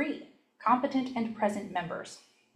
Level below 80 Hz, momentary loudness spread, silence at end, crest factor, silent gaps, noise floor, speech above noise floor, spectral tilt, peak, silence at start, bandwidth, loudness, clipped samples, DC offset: -74 dBFS; 15 LU; 0.35 s; 20 dB; none; -51 dBFS; 20 dB; -5.5 dB/octave; -12 dBFS; 0 s; 12.5 kHz; -31 LUFS; under 0.1%; under 0.1%